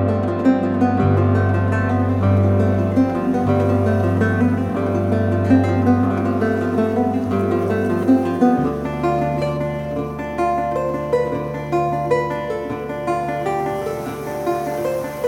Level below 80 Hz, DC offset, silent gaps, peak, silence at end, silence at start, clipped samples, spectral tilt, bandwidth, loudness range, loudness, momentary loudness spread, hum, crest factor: -44 dBFS; under 0.1%; none; -4 dBFS; 0 s; 0 s; under 0.1%; -8.5 dB/octave; 15 kHz; 4 LU; -19 LUFS; 8 LU; none; 14 dB